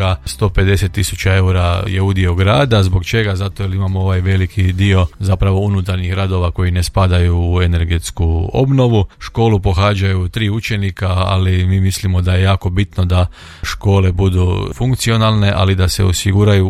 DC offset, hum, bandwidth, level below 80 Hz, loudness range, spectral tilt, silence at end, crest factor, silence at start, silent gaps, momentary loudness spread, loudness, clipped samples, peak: under 0.1%; none; 14 kHz; -28 dBFS; 1 LU; -6 dB/octave; 0 s; 12 dB; 0 s; none; 5 LU; -15 LUFS; under 0.1%; 0 dBFS